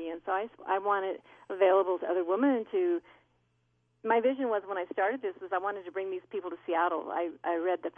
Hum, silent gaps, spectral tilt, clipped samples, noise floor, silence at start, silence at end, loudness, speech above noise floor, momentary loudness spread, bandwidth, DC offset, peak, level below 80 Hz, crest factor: 60 Hz at -70 dBFS; none; -7.5 dB/octave; under 0.1%; -74 dBFS; 0 s; 0.05 s; -31 LUFS; 43 dB; 10 LU; 3.6 kHz; under 0.1%; -14 dBFS; -80 dBFS; 18 dB